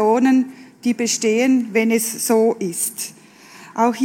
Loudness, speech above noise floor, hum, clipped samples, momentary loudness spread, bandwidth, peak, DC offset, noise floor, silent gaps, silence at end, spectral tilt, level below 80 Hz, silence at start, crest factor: -18 LUFS; 26 dB; none; under 0.1%; 12 LU; 17.5 kHz; -4 dBFS; under 0.1%; -43 dBFS; none; 0 s; -3.5 dB/octave; -78 dBFS; 0 s; 16 dB